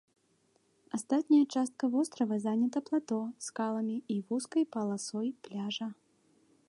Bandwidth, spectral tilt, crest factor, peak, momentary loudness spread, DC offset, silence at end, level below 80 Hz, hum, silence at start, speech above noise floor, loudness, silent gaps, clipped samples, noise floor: 11.5 kHz; -5 dB/octave; 16 dB; -16 dBFS; 12 LU; under 0.1%; 0.75 s; -86 dBFS; none; 0.95 s; 40 dB; -33 LUFS; none; under 0.1%; -72 dBFS